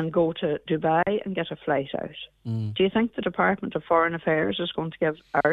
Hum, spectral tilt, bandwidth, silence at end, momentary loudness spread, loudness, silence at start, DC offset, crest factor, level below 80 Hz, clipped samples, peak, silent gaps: none; -8.5 dB/octave; 4.9 kHz; 0 s; 8 LU; -25 LUFS; 0 s; under 0.1%; 18 dB; -58 dBFS; under 0.1%; -6 dBFS; none